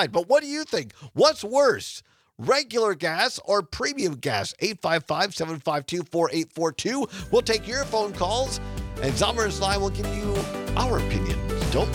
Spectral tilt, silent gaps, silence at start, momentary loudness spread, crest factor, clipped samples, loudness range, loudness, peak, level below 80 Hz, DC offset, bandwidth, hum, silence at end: -4 dB/octave; none; 0 s; 8 LU; 20 dB; under 0.1%; 2 LU; -25 LUFS; -4 dBFS; -38 dBFS; under 0.1%; 18.5 kHz; none; 0 s